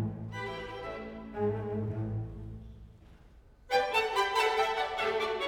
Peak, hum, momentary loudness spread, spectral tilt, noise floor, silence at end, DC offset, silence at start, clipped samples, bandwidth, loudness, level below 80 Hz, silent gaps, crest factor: -14 dBFS; none; 15 LU; -5 dB/octave; -57 dBFS; 0 s; under 0.1%; 0 s; under 0.1%; 18 kHz; -32 LUFS; -54 dBFS; none; 18 dB